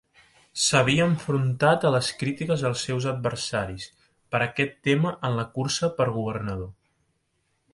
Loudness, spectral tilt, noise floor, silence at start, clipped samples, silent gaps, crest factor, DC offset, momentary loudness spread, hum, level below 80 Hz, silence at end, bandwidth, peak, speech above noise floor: -25 LUFS; -4.5 dB/octave; -73 dBFS; 0.55 s; under 0.1%; none; 20 dB; under 0.1%; 12 LU; none; -54 dBFS; 1 s; 11.5 kHz; -6 dBFS; 48 dB